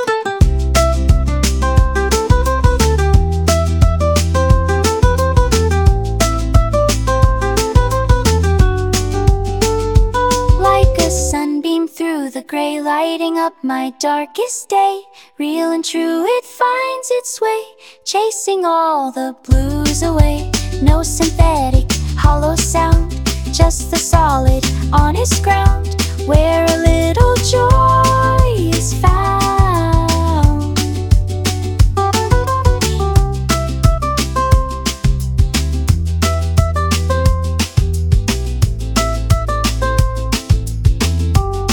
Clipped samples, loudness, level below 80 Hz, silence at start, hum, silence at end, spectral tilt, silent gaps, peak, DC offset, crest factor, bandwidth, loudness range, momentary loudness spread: under 0.1%; -15 LUFS; -18 dBFS; 0 s; none; 0 s; -5 dB/octave; none; 0 dBFS; under 0.1%; 14 dB; 19.5 kHz; 4 LU; 6 LU